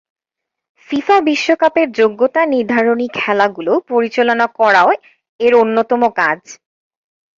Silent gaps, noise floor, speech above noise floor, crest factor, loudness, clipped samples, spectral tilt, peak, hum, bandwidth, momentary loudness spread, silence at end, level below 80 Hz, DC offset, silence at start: 5.29-5.39 s; -81 dBFS; 68 dB; 14 dB; -14 LUFS; under 0.1%; -4.5 dB/octave; 0 dBFS; none; 7.6 kHz; 6 LU; 0.85 s; -62 dBFS; under 0.1%; 0.9 s